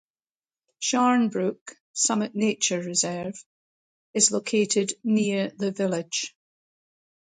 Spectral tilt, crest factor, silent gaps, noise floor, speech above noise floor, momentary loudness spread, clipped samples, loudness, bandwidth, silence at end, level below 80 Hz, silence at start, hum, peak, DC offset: -3 dB/octave; 22 dB; 1.61-1.66 s, 1.80-1.94 s, 3.46-4.14 s; under -90 dBFS; over 65 dB; 12 LU; under 0.1%; -24 LUFS; 9.6 kHz; 1.1 s; -72 dBFS; 0.8 s; none; -6 dBFS; under 0.1%